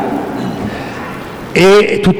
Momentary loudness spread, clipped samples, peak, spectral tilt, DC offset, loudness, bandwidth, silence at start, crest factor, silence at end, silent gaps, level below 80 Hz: 16 LU; under 0.1%; 0 dBFS; -5.5 dB/octave; under 0.1%; -12 LUFS; 18.5 kHz; 0 s; 12 dB; 0 s; none; -38 dBFS